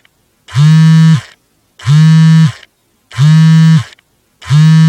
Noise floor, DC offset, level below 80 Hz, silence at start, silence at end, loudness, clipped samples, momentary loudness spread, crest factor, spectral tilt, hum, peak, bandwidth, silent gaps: -47 dBFS; under 0.1%; -50 dBFS; 0.5 s; 0 s; -7 LUFS; 0.1%; 12 LU; 8 dB; -7 dB/octave; none; 0 dBFS; 8.8 kHz; none